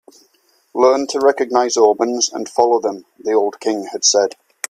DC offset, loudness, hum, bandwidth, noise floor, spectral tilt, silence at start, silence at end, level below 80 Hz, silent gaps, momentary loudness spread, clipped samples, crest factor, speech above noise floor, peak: under 0.1%; -16 LUFS; none; 15 kHz; -59 dBFS; -1.5 dB/octave; 0.75 s; 0.35 s; -66 dBFS; none; 9 LU; under 0.1%; 16 dB; 43 dB; 0 dBFS